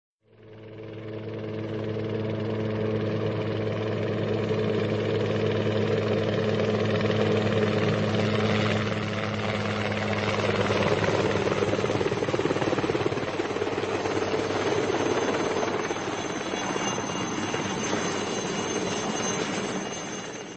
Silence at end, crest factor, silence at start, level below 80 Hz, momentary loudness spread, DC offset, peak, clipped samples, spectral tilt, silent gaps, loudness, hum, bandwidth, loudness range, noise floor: 0 s; 18 dB; 0.4 s; -54 dBFS; 6 LU; under 0.1%; -10 dBFS; under 0.1%; -5 dB/octave; none; -27 LUFS; none; 8.8 kHz; 4 LU; -50 dBFS